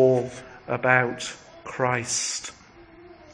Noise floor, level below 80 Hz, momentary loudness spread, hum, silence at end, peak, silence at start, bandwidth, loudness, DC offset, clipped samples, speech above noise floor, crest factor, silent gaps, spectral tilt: -49 dBFS; -60 dBFS; 18 LU; none; 0 s; -2 dBFS; 0 s; 10.5 kHz; -25 LUFS; under 0.1%; under 0.1%; 25 dB; 22 dB; none; -3.5 dB/octave